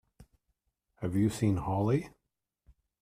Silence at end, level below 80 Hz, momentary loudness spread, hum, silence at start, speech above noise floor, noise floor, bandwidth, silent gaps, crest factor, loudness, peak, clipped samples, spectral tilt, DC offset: 0.9 s; -58 dBFS; 10 LU; none; 0.2 s; 52 dB; -81 dBFS; 14.5 kHz; none; 18 dB; -31 LUFS; -16 dBFS; under 0.1%; -7.5 dB/octave; under 0.1%